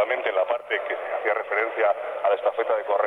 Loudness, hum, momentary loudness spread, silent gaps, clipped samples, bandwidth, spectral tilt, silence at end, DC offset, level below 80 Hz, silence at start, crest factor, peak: -25 LUFS; none; 4 LU; none; under 0.1%; 4.1 kHz; -3.5 dB/octave; 0 s; under 0.1%; -76 dBFS; 0 s; 16 dB; -8 dBFS